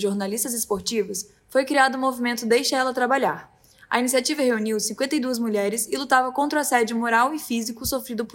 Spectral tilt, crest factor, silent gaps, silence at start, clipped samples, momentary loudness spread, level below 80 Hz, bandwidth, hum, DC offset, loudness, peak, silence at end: -2.5 dB/octave; 18 dB; none; 0 s; under 0.1%; 6 LU; -58 dBFS; 16.5 kHz; none; under 0.1%; -23 LUFS; -6 dBFS; 0.05 s